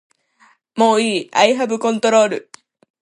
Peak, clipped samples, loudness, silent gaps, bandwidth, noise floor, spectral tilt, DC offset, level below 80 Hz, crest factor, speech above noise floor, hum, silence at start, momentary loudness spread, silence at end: 0 dBFS; under 0.1%; -16 LUFS; none; 11.5 kHz; -55 dBFS; -3.5 dB/octave; under 0.1%; -72 dBFS; 18 dB; 40 dB; none; 0.75 s; 6 LU; 0.6 s